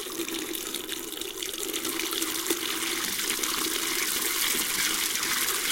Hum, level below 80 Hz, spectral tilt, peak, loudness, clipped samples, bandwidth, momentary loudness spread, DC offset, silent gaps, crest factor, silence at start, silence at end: none; -58 dBFS; 0 dB/octave; -6 dBFS; -27 LUFS; under 0.1%; 17 kHz; 8 LU; under 0.1%; none; 22 dB; 0 s; 0 s